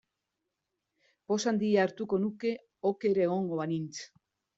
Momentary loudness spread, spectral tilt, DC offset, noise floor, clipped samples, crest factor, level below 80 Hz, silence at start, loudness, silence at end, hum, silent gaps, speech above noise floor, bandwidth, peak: 9 LU; -5.5 dB/octave; under 0.1%; -85 dBFS; under 0.1%; 18 dB; -76 dBFS; 1.3 s; -31 LUFS; 0.5 s; none; none; 55 dB; 8 kHz; -14 dBFS